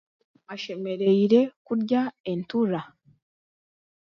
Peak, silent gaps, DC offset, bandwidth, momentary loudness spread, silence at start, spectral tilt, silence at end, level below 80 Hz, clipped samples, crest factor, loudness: -8 dBFS; 1.56-1.65 s, 2.20-2.24 s; under 0.1%; 6.8 kHz; 14 LU; 0.5 s; -8 dB/octave; 1.2 s; -72 dBFS; under 0.1%; 18 dB; -25 LUFS